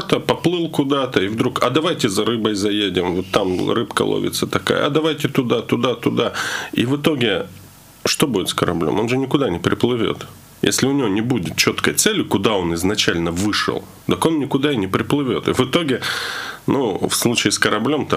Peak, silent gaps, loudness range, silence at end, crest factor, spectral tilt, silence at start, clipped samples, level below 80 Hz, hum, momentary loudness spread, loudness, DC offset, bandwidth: 0 dBFS; none; 2 LU; 0 s; 18 dB; -4 dB/octave; 0 s; under 0.1%; -50 dBFS; none; 5 LU; -19 LUFS; under 0.1%; 16 kHz